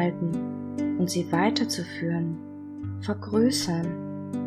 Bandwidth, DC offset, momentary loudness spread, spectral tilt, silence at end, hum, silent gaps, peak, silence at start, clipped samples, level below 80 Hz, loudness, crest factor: 14.5 kHz; under 0.1%; 11 LU; -5.5 dB/octave; 0 s; none; none; -10 dBFS; 0 s; under 0.1%; -64 dBFS; -28 LUFS; 18 dB